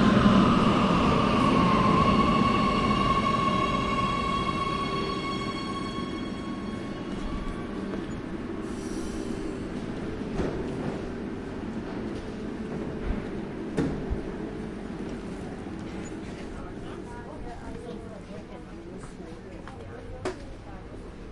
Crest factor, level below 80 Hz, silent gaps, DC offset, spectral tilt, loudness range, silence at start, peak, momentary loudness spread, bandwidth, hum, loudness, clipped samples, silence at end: 22 dB; -42 dBFS; none; under 0.1%; -6.5 dB/octave; 17 LU; 0 s; -6 dBFS; 19 LU; 11.5 kHz; none; -28 LUFS; under 0.1%; 0 s